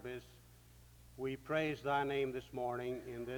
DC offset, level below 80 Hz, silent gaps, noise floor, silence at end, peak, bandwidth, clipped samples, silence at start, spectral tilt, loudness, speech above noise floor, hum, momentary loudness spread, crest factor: under 0.1%; -64 dBFS; none; -61 dBFS; 0 s; -22 dBFS; over 20 kHz; under 0.1%; 0 s; -6 dB/octave; -39 LUFS; 22 dB; none; 14 LU; 18 dB